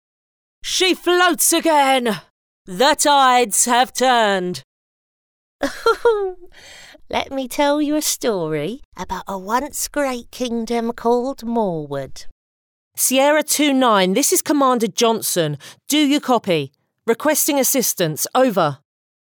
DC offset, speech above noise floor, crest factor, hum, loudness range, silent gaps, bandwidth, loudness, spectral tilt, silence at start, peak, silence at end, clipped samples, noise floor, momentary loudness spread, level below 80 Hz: under 0.1%; over 72 dB; 14 dB; none; 7 LU; 2.30-2.65 s, 4.64-5.59 s, 8.85-8.92 s, 12.32-12.91 s; over 20 kHz; -17 LUFS; -2.5 dB/octave; 0.65 s; -4 dBFS; 0.6 s; under 0.1%; under -90 dBFS; 14 LU; -50 dBFS